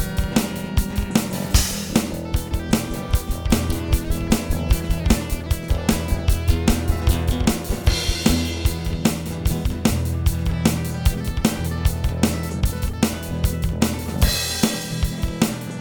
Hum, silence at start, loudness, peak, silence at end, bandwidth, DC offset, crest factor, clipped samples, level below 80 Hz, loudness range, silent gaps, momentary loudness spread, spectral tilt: none; 0 s; -22 LUFS; -2 dBFS; 0 s; over 20 kHz; under 0.1%; 18 dB; under 0.1%; -24 dBFS; 2 LU; none; 4 LU; -5 dB/octave